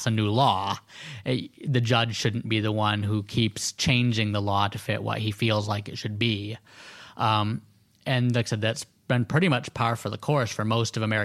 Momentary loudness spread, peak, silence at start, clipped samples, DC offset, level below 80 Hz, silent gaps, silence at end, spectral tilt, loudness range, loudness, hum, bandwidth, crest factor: 11 LU; -6 dBFS; 0 s; under 0.1%; under 0.1%; -58 dBFS; none; 0 s; -5 dB/octave; 3 LU; -26 LUFS; none; 14 kHz; 20 dB